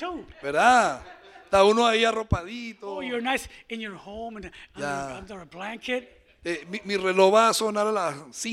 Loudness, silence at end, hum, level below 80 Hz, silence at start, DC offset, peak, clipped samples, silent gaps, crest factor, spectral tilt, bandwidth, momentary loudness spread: -24 LUFS; 0 s; none; -48 dBFS; 0 s; under 0.1%; -6 dBFS; under 0.1%; none; 20 dB; -4 dB/octave; 15.5 kHz; 19 LU